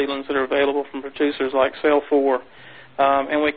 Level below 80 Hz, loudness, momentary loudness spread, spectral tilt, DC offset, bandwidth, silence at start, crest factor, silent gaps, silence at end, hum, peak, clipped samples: -56 dBFS; -20 LUFS; 8 LU; -9 dB/octave; 0.3%; 4.8 kHz; 0 s; 16 dB; none; 0 s; none; -6 dBFS; under 0.1%